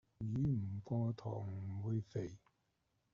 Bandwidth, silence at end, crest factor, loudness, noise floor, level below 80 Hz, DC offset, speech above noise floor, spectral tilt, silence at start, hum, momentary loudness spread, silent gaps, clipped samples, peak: 7 kHz; 0.75 s; 12 dB; -42 LUFS; -82 dBFS; -68 dBFS; under 0.1%; 41 dB; -10.5 dB/octave; 0.2 s; none; 8 LU; none; under 0.1%; -28 dBFS